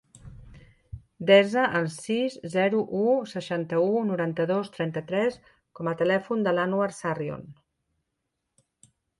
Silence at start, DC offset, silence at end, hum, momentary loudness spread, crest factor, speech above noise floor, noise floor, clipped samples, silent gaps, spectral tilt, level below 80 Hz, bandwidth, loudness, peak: 0.15 s; under 0.1%; 1.65 s; none; 12 LU; 22 dB; 56 dB; -81 dBFS; under 0.1%; none; -6 dB/octave; -60 dBFS; 11.5 kHz; -26 LUFS; -6 dBFS